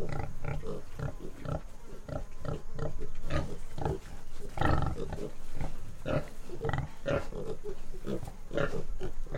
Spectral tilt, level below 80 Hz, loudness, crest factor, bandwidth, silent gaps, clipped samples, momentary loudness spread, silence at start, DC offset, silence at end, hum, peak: -7 dB/octave; -38 dBFS; -38 LUFS; 16 dB; 9.4 kHz; none; under 0.1%; 10 LU; 0 s; under 0.1%; 0 s; none; -14 dBFS